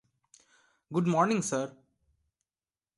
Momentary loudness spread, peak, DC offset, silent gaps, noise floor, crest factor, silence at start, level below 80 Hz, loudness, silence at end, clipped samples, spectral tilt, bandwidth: 9 LU; -12 dBFS; under 0.1%; none; under -90 dBFS; 20 dB; 0.9 s; -74 dBFS; -29 LUFS; 1.3 s; under 0.1%; -5.5 dB/octave; 11.5 kHz